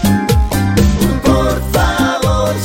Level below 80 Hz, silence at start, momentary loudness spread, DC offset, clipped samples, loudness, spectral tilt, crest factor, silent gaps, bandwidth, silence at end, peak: -18 dBFS; 0 s; 2 LU; under 0.1%; under 0.1%; -13 LUFS; -5.5 dB/octave; 12 dB; none; 17 kHz; 0 s; 0 dBFS